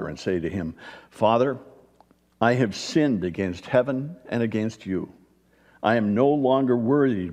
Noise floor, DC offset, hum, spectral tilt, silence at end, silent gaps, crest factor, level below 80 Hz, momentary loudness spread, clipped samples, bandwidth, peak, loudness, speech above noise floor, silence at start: -59 dBFS; under 0.1%; none; -6.5 dB/octave; 0 s; none; 18 dB; -58 dBFS; 11 LU; under 0.1%; 10.5 kHz; -6 dBFS; -24 LUFS; 36 dB; 0 s